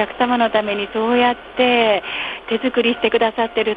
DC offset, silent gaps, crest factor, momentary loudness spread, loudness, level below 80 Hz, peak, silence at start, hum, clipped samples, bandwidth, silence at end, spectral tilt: under 0.1%; none; 16 dB; 6 LU; -18 LUFS; -52 dBFS; -2 dBFS; 0 s; none; under 0.1%; 5 kHz; 0 s; -6.5 dB/octave